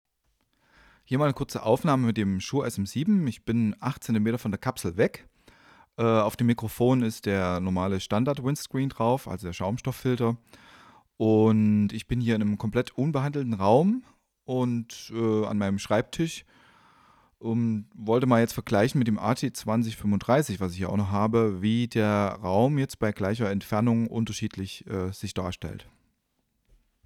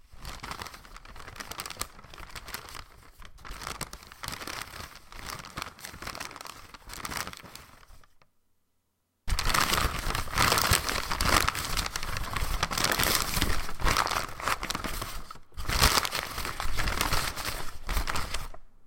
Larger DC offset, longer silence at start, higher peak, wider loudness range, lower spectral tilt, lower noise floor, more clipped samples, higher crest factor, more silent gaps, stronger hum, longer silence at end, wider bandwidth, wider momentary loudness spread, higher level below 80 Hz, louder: neither; first, 1.1 s vs 0.1 s; second, -8 dBFS vs -4 dBFS; second, 4 LU vs 14 LU; first, -7 dB/octave vs -2 dB/octave; about the same, -75 dBFS vs -76 dBFS; neither; second, 18 dB vs 26 dB; neither; neither; first, 1.25 s vs 0 s; about the same, 16 kHz vs 17 kHz; second, 10 LU vs 20 LU; second, -54 dBFS vs -38 dBFS; first, -26 LUFS vs -30 LUFS